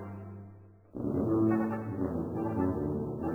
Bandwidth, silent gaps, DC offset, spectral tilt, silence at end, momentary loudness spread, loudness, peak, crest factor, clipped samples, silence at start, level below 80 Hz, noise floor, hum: 2.9 kHz; none; under 0.1%; -11 dB/octave; 0 s; 19 LU; -32 LUFS; -18 dBFS; 14 dB; under 0.1%; 0 s; -54 dBFS; -53 dBFS; none